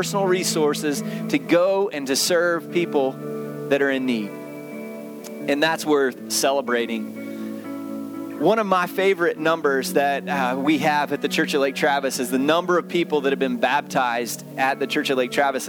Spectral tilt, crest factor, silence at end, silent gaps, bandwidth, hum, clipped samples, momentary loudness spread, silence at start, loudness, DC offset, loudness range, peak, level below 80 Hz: -4 dB/octave; 18 dB; 0 s; none; over 20 kHz; none; under 0.1%; 12 LU; 0 s; -22 LUFS; under 0.1%; 3 LU; -4 dBFS; -74 dBFS